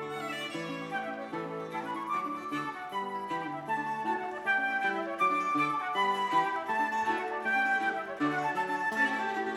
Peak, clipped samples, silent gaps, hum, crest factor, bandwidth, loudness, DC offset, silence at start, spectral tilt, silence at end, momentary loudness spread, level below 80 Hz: -16 dBFS; under 0.1%; none; none; 16 dB; 16 kHz; -31 LUFS; under 0.1%; 0 s; -4.5 dB/octave; 0 s; 8 LU; -76 dBFS